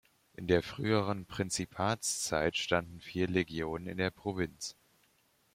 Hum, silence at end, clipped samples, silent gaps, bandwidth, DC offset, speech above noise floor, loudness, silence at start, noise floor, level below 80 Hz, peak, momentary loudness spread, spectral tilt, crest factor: none; 0.8 s; under 0.1%; none; 16 kHz; under 0.1%; 38 dB; -34 LUFS; 0.4 s; -71 dBFS; -60 dBFS; -12 dBFS; 7 LU; -4 dB/octave; 22 dB